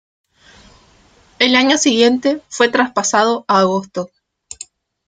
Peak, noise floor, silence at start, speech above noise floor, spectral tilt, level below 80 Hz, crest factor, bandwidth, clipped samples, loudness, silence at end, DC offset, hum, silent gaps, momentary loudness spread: 0 dBFS; -51 dBFS; 1.4 s; 36 dB; -3 dB/octave; -58 dBFS; 16 dB; 9.6 kHz; under 0.1%; -14 LUFS; 1 s; under 0.1%; none; none; 21 LU